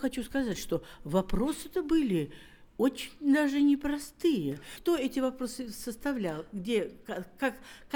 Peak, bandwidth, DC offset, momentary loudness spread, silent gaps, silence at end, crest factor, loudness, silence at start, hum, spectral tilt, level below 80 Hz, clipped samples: -14 dBFS; 20 kHz; under 0.1%; 11 LU; none; 0 s; 16 dB; -31 LUFS; 0 s; none; -5.5 dB/octave; -48 dBFS; under 0.1%